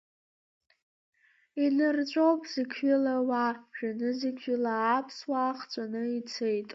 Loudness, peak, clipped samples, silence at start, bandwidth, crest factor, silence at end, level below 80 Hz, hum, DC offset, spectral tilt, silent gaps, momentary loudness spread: -30 LUFS; -14 dBFS; under 0.1%; 1.55 s; 7.6 kHz; 16 dB; 0 s; -84 dBFS; none; under 0.1%; -5 dB/octave; none; 8 LU